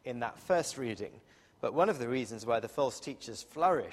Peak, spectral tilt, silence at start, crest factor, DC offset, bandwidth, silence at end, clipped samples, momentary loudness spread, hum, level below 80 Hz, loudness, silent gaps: -14 dBFS; -4.5 dB/octave; 0.05 s; 20 dB; under 0.1%; 14.5 kHz; 0 s; under 0.1%; 13 LU; none; -70 dBFS; -34 LUFS; none